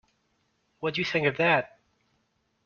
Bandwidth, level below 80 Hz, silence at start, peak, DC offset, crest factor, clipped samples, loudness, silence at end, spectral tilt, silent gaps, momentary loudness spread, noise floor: 7.2 kHz; -68 dBFS; 0.8 s; -10 dBFS; under 0.1%; 20 dB; under 0.1%; -26 LUFS; 1 s; -3 dB/octave; none; 11 LU; -73 dBFS